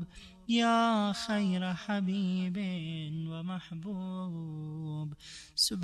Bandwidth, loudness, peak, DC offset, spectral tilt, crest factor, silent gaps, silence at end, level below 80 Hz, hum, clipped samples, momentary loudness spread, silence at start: 13.5 kHz; -33 LUFS; -16 dBFS; under 0.1%; -5 dB/octave; 18 dB; none; 0 s; -64 dBFS; none; under 0.1%; 13 LU; 0 s